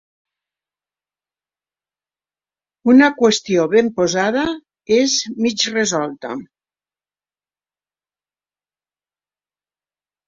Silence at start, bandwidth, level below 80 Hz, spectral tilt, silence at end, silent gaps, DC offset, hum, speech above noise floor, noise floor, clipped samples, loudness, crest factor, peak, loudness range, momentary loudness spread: 2.85 s; 7.8 kHz; -60 dBFS; -3.5 dB/octave; 3.85 s; none; under 0.1%; 50 Hz at -55 dBFS; over 74 dB; under -90 dBFS; under 0.1%; -16 LUFS; 18 dB; -2 dBFS; 9 LU; 14 LU